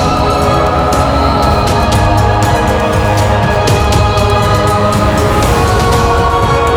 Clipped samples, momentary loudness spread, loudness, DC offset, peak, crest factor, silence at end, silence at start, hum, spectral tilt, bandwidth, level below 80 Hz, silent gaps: under 0.1%; 1 LU; -10 LUFS; under 0.1%; 0 dBFS; 10 dB; 0 s; 0 s; none; -5.5 dB/octave; 19 kHz; -18 dBFS; none